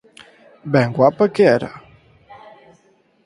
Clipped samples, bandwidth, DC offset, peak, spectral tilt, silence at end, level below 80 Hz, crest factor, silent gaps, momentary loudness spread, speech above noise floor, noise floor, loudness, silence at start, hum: under 0.1%; 11 kHz; under 0.1%; 0 dBFS; -7.5 dB/octave; 1.45 s; -58 dBFS; 20 dB; none; 15 LU; 42 dB; -57 dBFS; -16 LUFS; 0.65 s; none